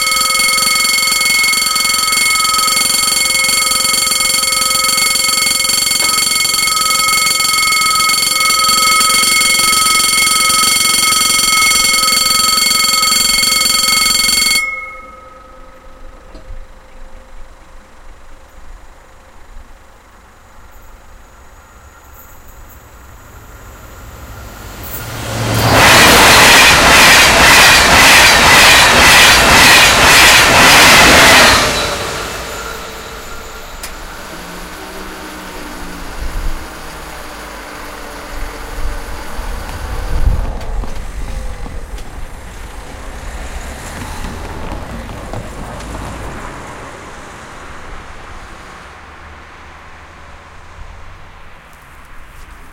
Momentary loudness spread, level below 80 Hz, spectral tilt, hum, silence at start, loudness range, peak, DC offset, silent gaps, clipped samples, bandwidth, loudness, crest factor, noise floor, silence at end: 24 LU; -28 dBFS; -1 dB/octave; none; 0 s; 24 LU; 0 dBFS; under 0.1%; none; 0.3%; over 20 kHz; -7 LUFS; 12 dB; -41 dBFS; 0.05 s